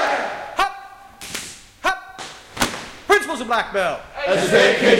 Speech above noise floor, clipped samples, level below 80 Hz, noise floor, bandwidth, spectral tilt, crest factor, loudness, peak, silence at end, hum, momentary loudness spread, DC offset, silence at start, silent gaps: 22 dB; under 0.1%; -48 dBFS; -39 dBFS; 17 kHz; -3 dB/octave; 20 dB; -20 LUFS; 0 dBFS; 0 s; none; 19 LU; under 0.1%; 0 s; none